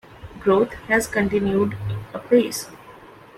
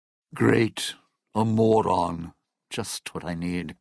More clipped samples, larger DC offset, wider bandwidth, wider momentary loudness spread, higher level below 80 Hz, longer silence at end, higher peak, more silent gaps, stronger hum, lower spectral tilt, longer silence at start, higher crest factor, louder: neither; neither; first, 16 kHz vs 11 kHz; second, 12 LU vs 16 LU; first, -48 dBFS vs -54 dBFS; first, 0.25 s vs 0.05 s; about the same, -4 dBFS vs -6 dBFS; neither; neither; about the same, -5.5 dB/octave vs -5.5 dB/octave; second, 0.15 s vs 0.35 s; about the same, 18 dB vs 20 dB; first, -21 LUFS vs -25 LUFS